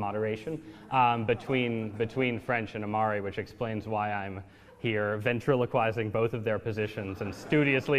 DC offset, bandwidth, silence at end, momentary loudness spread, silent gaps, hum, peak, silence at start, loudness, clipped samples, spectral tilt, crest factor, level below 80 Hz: under 0.1%; 14.5 kHz; 0 s; 10 LU; none; none; -12 dBFS; 0 s; -30 LUFS; under 0.1%; -7 dB/octave; 18 dB; -62 dBFS